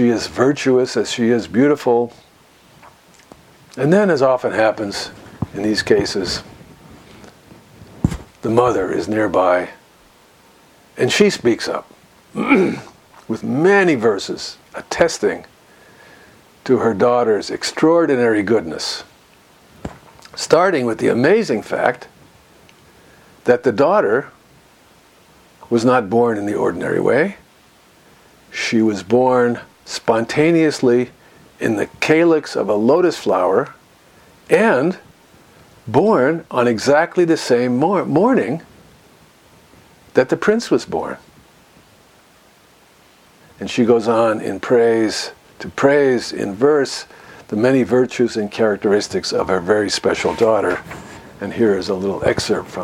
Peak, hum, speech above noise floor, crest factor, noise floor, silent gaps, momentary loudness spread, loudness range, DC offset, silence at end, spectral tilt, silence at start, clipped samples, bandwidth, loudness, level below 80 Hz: 0 dBFS; none; 34 dB; 18 dB; -50 dBFS; none; 14 LU; 4 LU; under 0.1%; 0 s; -5 dB/octave; 0 s; under 0.1%; 15.5 kHz; -17 LUFS; -50 dBFS